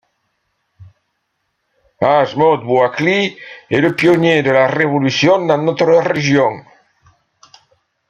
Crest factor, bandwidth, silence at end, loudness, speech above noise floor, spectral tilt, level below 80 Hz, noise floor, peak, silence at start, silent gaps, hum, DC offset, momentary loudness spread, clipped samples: 16 dB; 9.6 kHz; 1.5 s; -14 LUFS; 56 dB; -6 dB/octave; -58 dBFS; -69 dBFS; 0 dBFS; 0.8 s; none; none; under 0.1%; 7 LU; under 0.1%